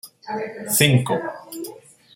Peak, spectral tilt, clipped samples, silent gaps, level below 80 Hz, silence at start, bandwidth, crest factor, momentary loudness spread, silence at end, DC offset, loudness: 0 dBFS; -4 dB/octave; under 0.1%; none; -60 dBFS; 0.05 s; 16.5 kHz; 22 dB; 18 LU; 0.4 s; under 0.1%; -20 LUFS